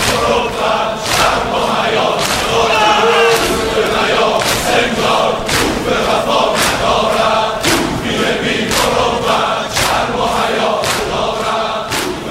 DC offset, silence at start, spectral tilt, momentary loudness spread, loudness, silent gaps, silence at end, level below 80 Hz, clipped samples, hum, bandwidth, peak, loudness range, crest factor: under 0.1%; 0 s; -3 dB/octave; 5 LU; -13 LUFS; none; 0 s; -34 dBFS; under 0.1%; none; 16.5 kHz; 0 dBFS; 2 LU; 14 dB